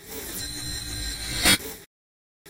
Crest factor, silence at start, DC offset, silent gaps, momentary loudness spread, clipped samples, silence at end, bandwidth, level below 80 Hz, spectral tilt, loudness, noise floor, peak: 24 dB; 0 s; under 0.1%; 1.86-2.45 s; 15 LU; under 0.1%; 0 s; 16.5 kHz; -42 dBFS; -1.5 dB/octave; -25 LUFS; under -90 dBFS; -4 dBFS